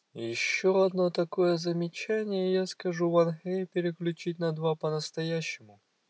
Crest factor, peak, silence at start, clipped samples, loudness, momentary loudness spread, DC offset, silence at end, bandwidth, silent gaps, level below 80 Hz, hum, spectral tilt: 16 dB; -14 dBFS; 0.15 s; under 0.1%; -29 LUFS; 8 LU; under 0.1%; 0.45 s; 8 kHz; none; -90 dBFS; none; -5.5 dB/octave